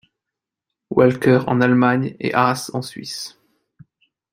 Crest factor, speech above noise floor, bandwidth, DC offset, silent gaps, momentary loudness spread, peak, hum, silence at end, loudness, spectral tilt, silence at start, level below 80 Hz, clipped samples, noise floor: 18 dB; 67 dB; 16 kHz; under 0.1%; none; 14 LU; -2 dBFS; none; 1.05 s; -18 LUFS; -6 dB/octave; 0.9 s; -58 dBFS; under 0.1%; -85 dBFS